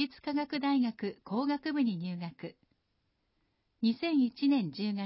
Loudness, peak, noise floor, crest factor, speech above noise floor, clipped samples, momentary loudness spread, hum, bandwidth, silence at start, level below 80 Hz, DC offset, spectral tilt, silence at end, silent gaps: -32 LUFS; -18 dBFS; -78 dBFS; 14 dB; 46 dB; under 0.1%; 11 LU; none; 5.8 kHz; 0 s; -76 dBFS; under 0.1%; -9.5 dB/octave; 0 s; none